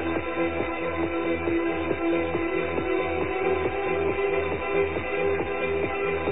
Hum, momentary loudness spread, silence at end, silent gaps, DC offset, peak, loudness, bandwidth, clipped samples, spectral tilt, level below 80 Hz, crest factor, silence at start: none; 2 LU; 0 s; none; 0.9%; -12 dBFS; -26 LUFS; 4 kHz; under 0.1%; -10 dB/octave; -46 dBFS; 14 dB; 0 s